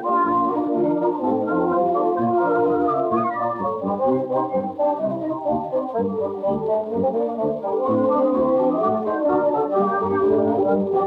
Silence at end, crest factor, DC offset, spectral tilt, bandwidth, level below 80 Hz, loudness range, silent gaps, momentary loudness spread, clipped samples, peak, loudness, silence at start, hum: 0 s; 12 dB; under 0.1%; -10 dB/octave; 5 kHz; -60 dBFS; 3 LU; none; 5 LU; under 0.1%; -8 dBFS; -21 LUFS; 0 s; none